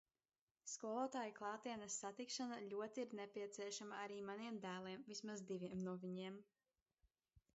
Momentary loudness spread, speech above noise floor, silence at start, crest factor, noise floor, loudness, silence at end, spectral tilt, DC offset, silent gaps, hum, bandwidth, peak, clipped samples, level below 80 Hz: 5 LU; over 40 dB; 0.65 s; 18 dB; under -90 dBFS; -50 LUFS; 0.15 s; -4 dB/octave; under 0.1%; 6.82-6.86 s; none; 8 kHz; -32 dBFS; under 0.1%; -88 dBFS